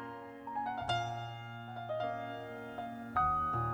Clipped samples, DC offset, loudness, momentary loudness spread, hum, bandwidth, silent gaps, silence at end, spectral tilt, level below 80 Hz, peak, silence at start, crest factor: under 0.1%; under 0.1%; -38 LUFS; 13 LU; none; over 20 kHz; none; 0 s; -6 dB/octave; -58 dBFS; -20 dBFS; 0 s; 18 dB